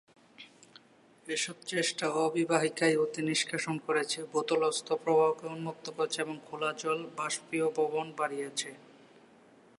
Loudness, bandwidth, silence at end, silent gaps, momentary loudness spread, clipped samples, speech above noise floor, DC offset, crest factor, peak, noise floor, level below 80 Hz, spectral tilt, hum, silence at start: -31 LUFS; 11.5 kHz; 1 s; none; 9 LU; under 0.1%; 29 dB; under 0.1%; 20 dB; -14 dBFS; -61 dBFS; -84 dBFS; -3.5 dB/octave; none; 0.4 s